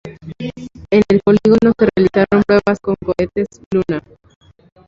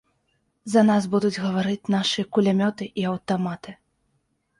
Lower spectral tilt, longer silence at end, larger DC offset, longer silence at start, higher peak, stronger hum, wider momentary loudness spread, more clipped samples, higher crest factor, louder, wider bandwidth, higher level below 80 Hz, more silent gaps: first, -8 dB/octave vs -6 dB/octave; about the same, 0.9 s vs 0.85 s; neither; second, 0.05 s vs 0.65 s; first, -2 dBFS vs -6 dBFS; neither; first, 16 LU vs 11 LU; neither; about the same, 14 dB vs 18 dB; first, -14 LUFS vs -23 LUFS; second, 7.4 kHz vs 11.5 kHz; first, -42 dBFS vs -64 dBFS; first, 3.66-3.71 s vs none